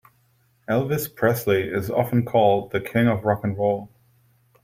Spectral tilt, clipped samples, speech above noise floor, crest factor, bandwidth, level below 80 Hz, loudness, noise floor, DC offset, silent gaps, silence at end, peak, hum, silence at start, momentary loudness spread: -7 dB/octave; under 0.1%; 41 dB; 18 dB; 16.5 kHz; -58 dBFS; -22 LUFS; -63 dBFS; under 0.1%; none; 0.75 s; -4 dBFS; none; 0.7 s; 6 LU